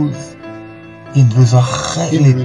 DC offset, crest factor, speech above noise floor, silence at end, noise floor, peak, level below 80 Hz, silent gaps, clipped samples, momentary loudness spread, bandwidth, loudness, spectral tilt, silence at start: 0.1%; 12 dB; 22 dB; 0 s; -33 dBFS; 0 dBFS; -46 dBFS; none; under 0.1%; 22 LU; 10.5 kHz; -13 LUFS; -6.5 dB/octave; 0 s